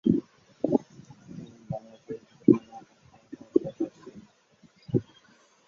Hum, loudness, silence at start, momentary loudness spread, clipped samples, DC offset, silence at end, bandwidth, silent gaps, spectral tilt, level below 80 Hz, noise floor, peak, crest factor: none; -29 LUFS; 0.05 s; 26 LU; under 0.1%; under 0.1%; 0.65 s; 7.2 kHz; none; -9.5 dB/octave; -64 dBFS; -61 dBFS; -4 dBFS; 26 dB